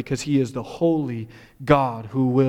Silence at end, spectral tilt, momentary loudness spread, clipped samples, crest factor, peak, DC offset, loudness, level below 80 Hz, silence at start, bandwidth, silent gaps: 0 s; -7 dB/octave; 14 LU; under 0.1%; 18 dB; -4 dBFS; under 0.1%; -22 LUFS; -48 dBFS; 0 s; 13.5 kHz; none